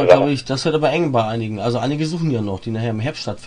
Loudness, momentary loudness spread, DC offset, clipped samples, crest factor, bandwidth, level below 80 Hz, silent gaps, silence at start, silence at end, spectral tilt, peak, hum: -19 LUFS; 8 LU; under 0.1%; under 0.1%; 18 dB; 10.5 kHz; -50 dBFS; none; 0 s; 0 s; -6.5 dB/octave; 0 dBFS; none